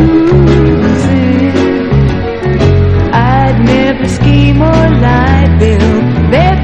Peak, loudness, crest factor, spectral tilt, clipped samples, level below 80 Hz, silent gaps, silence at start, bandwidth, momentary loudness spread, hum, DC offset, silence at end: 0 dBFS; -8 LUFS; 8 dB; -8 dB/octave; 1%; -16 dBFS; none; 0 s; 9 kHz; 4 LU; none; 2%; 0 s